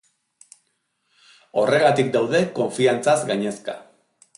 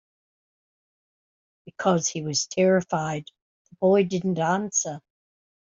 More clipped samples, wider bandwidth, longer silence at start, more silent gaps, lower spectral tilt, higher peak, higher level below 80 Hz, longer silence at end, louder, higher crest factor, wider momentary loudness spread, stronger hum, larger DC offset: neither; first, 11.5 kHz vs 7.8 kHz; about the same, 1.55 s vs 1.65 s; second, none vs 3.42-3.65 s; about the same, -5 dB/octave vs -4.5 dB/octave; about the same, -6 dBFS vs -8 dBFS; about the same, -68 dBFS vs -68 dBFS; about the same, 0.55 s vs 0.65 s; first, -20 LUFS vs -24 LUFS; about the same, 18 dB vs 18 dB; first, 13 LU vs 10 LU; neither; neither